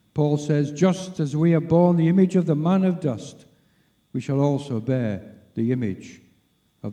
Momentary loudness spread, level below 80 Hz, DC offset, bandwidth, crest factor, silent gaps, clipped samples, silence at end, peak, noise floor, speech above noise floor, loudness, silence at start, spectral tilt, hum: 16 LU; -60 dBFS; under 0.1%; 9.6 kHz; 18 dB; none; under 0.1%; 0 s; -6 dBFS; -64 dBFS; 43 dB; -22 LUFS; 0.15 s; -8 dB/octave; none